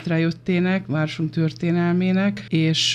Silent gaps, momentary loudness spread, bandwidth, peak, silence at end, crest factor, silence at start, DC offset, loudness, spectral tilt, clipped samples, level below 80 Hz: none; 4 LU; 10.5 kHz; -6 dBFS; 0 s; 14 dB; 0 s; under 0.1%; -21 LUFS; -5.5 dB/octave; under 0.1%; -58 dBFS